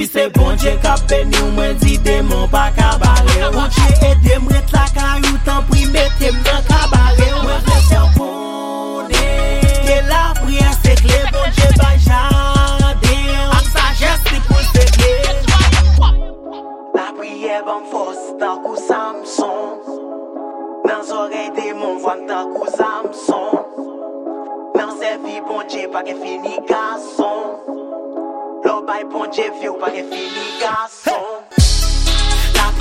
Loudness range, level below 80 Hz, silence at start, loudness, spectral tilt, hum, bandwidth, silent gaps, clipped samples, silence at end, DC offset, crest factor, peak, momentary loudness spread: 9 LU; -16 dBFS; 0 s; -15 LUFS; -5 dB/octave; none; 16.5 kHz; none; under 0.1%; 0 s; under 0.1%; 14 dB; 0 dBFS; 13 LU